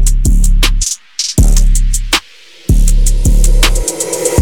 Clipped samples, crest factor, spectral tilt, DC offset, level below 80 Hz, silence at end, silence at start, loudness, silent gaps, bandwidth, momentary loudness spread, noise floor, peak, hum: under 0.1%; 8 dB; -3.5 dB/octave; 1%; -10 dBFS; 0 s; 0 s; -13 LUFS; none; 17.5 kHz; 4 LU; -39 dBFS; 0 dBFS; none